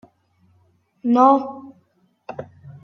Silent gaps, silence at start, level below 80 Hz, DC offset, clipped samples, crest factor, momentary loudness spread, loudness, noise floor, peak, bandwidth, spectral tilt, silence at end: none; 1.05 s; -72 dBFS; under 0.1%; under 0.1%; 20 dB; 25 LU; -17 LUFS; -62 dBFS; -2 dBFS; 6.4 kHz; -8 dB/octave; 0.05 s